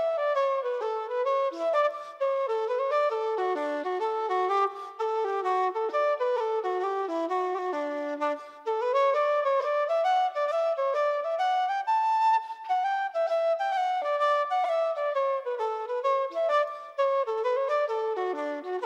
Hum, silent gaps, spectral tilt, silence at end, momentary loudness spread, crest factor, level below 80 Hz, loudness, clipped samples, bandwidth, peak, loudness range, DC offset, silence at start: none; none; -1.5 dB/octave; 0 s; 6 LU; 12 dB; under -90 dBFS; -27 LUFS; under 0.1%; 8.8 kHz; -16 dBFS; 2 LU; under 0.1%; 0 s